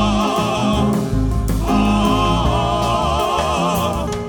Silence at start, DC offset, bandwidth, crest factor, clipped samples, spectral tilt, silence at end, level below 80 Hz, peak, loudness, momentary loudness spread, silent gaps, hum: 0 s; under 0.1%; over 20 kHz; 12 dB; under 0.1%; -5.5 dB/octave; 0 s; -26 dBFS; -4 dBFS; -17 LUFS; 4 LU; none; none